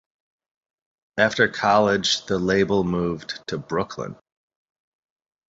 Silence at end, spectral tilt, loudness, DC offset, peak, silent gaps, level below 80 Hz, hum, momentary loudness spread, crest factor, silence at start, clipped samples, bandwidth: 1.35 s; -4.5 dB/octave; -22 LUFS; under 0.1%; -2 dBFS; none; -52 dBFS; none; 13 LU; 22 dB; 1.15 s; under 0.1%; 8 kHz